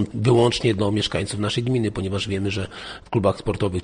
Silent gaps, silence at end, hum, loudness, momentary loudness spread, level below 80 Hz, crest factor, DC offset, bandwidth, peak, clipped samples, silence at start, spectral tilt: none; 0 s; none; -22 LUFS; 9 LU; -44 dBFS; 16 dB; under 0.1%; 10 kHz; -6 dBFS; under 0.1%; 0 s; -6 dB/octave